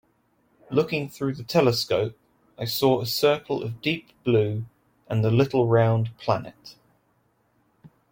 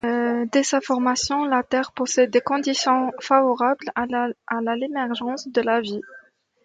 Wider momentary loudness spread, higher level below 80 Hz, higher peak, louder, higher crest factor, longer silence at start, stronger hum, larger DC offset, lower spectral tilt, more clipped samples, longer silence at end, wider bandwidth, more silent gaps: first, 10 LU vs 7 LU; about the same, -60 dBFS vs -60 dBFS; about the same, -6 dBFS vs -4 dBFS; about the same, -24 LUFS vs -22 LUFS; about the same, 20 dB vs 18 dB; first, 0.7 s vs 0.05 s; neither; neither; first, -6 dB/octave vs -2.5 dB/octave; neither; second, 0.25 s vs 0.45 s; first, 16.5 kHz vs 9.4 kHz; neither